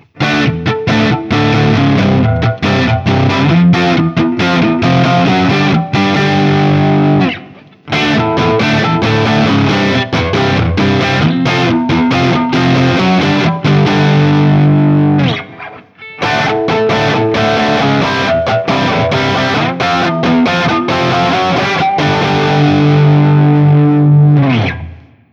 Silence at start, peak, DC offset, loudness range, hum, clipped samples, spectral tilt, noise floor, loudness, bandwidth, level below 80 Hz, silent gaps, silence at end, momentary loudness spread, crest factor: 0.15 s; 0 dBFS; under 0.1%; 2 LU; none; under 0.1%; -7 dB/octave; -35 dBFS; -11 LUFS; 7.4 kHz; -38 dBFS; none; 0.35 s; 4 LU; 10 dB